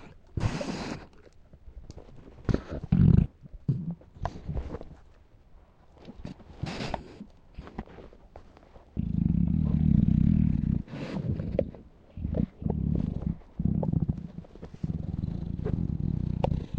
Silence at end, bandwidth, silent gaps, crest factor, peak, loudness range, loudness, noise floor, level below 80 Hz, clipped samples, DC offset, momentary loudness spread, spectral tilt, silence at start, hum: 0 s; 8.4 kHz; none; 22 dB; -8 dBFS; 14 LU; -30 LUFS; -55 dBFS; -38 dBFS; under 0.1%; under 0.1%; 22 LU; -9 dB/octave; 0 s; none